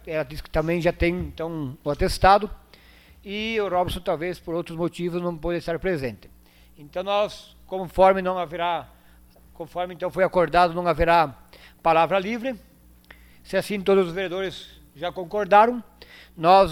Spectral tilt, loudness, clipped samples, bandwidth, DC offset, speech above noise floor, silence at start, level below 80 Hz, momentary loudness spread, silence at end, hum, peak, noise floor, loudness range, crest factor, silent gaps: -6 dB/octave; -23 LUFS; under 0.1%; 16.5 kHz; under 0.1%; 30 dB; 0.05 s; -42 dBFS; 14 LU; 0 s; 60 Hz at -55 dBFS; -2 dBFS; -52 dBFS; 6 LU; 20 dB; none